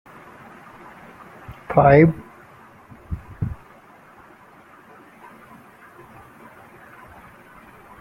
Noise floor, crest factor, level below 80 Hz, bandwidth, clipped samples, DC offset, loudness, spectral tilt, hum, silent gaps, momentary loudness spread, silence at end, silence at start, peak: -48 dBFS; 24 dB; -46 dBFS; 13 kHz; under 0.1%; under 0.1%; -18 LUFS; -9.5 dB/octave; none; none; 31 LU; 4.5 s; 1.5 s; 0 dBFS